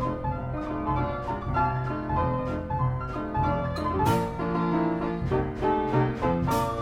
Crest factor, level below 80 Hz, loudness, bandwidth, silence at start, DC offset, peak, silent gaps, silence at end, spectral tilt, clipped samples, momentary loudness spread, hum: 16 dB; -40 dBFS; -27 LUFS; 16 kHz; 0 s; under 0.1%; -10 dBFS; none; 0 s; -7.5 dB/octave; under 0.1%; 6 LU; none